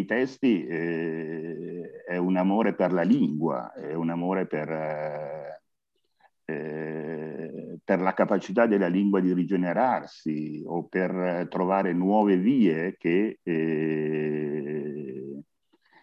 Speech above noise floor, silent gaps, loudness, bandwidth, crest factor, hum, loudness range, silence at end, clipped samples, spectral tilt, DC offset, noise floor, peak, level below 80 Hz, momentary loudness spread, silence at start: 54 dB; none; -27 LUFS; 7.2 kHz; 18 dB; none; 7 LU; 0.6 s; under 0.1%; -8.5 dB/octave; under 0.1%; -79 dBFS; -8 dBFS; -74 dBFS; 14 LU; 0 s